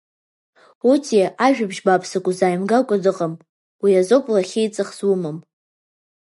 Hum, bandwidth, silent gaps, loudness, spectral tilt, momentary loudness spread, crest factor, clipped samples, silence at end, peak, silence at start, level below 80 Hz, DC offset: none; 11.5 kHz; 3.49-3.79 s; -19 LUFS; -5.5 dB/octave; 8 LU; 18 dB; under 0.1%; 1 s; -2 dBFS; 0.85 s; -74 dBFS; under 0.1%